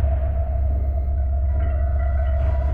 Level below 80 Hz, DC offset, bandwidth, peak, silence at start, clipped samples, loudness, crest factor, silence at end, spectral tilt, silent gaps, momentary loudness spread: -20 dBFS; under 0.1%; 2.9 kHz; -10 dBFS; 0 s; under 0.1%; -23 LUFS; 10 dB; 0 s; -11 dB/octave; none; 2 LU